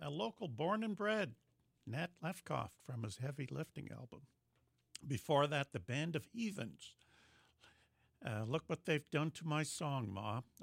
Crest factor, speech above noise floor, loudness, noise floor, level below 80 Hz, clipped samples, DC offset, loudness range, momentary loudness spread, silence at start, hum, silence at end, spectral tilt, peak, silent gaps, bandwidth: 20 dB; 38 dB; -42 LUFS; -80 dBFS; -76 dBFS; under 0.1%; under 0.1%; 5 LU; 14 LU; 0 s; none; 0 s; -5.5 dB/octave; -22 dBFS; none; 16 kHz